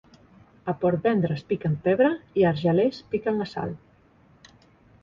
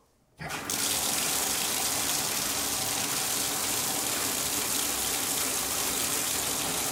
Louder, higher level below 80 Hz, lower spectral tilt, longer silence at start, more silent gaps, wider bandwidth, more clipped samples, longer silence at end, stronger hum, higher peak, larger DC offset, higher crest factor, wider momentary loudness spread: about the same, -25 LUFS vs -27 LUFS; about the same, -58 dBFS vs -56 dBFS; first, -9 dB/octave vs -0.5 dB/octave; first, 0.65 s vs 0.4 s; neither; second, 7.2 kHz vs 16 kHz; neither; first, 1.25 s vs 0 s; neither; about the same, -8 dBFS vs -10 dBFS; neither; about the same, 18 dB vs 20 dB; first, 11 LU vs 2 LU